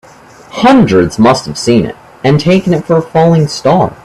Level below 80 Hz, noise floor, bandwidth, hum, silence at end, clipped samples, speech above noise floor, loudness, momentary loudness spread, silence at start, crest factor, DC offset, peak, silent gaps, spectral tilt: -40 dBFS; -37 dBFS; 12.5 kHz; none; 0.1 s; under 0.1%; 28 dB; -9 LUFS; 6 LU; 0.55 s; 10 dB; under 0.1%; 0 dBFS; none; -6.5 dB/octave